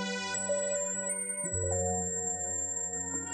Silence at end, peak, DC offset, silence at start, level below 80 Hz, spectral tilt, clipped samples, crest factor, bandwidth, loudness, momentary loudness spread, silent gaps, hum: 0 s; -20 dBFS; under 0.1%; 0 s; -60 dBFS; -2.5 dB/octave; under 0.1%; 14 dB; 10 kHz; -31 LUFS; 2 LU; none; none